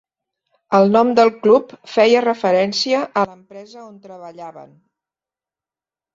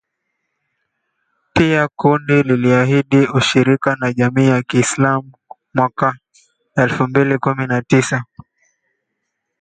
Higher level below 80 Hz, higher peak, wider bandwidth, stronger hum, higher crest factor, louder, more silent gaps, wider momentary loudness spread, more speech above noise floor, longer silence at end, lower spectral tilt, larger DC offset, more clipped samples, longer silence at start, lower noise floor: second, -64 dBFS vs -50 dBFS; about the same, 0 dBFS vs 0 dBFS; second, 7.8 kHz vs 9.4 kHz; neither; about the same, 18 dB vs 16 dB; about the same, -16 LUFS vs -15 LUFS; neither; first, 23 LU vs 7 LU; first, over 73 dB vs 60 dB; first, 1.5 s vs 1.35 s; about the same, -5 dB/octave vs -6 dB/octave; neither; neither; second, 0.7 s vs 1.55 s; first, under -90 dBFS vs -75 dBFS